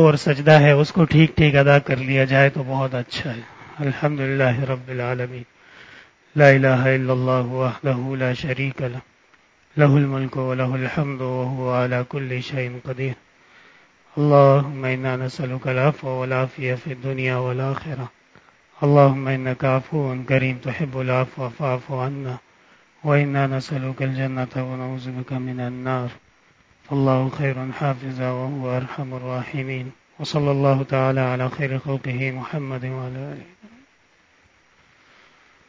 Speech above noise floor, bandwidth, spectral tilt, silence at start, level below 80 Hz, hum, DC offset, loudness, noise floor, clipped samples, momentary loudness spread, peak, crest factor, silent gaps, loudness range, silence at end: 38 dB; 7.8 kHz; -8 dB/octave; 0 s; -52 dBFS; none; under 0.1%; -21 LUFS; -58 dBFS; under 0.1%; 14 LU; 0 dBFS; 22 dB; none; 6 LU; 2 s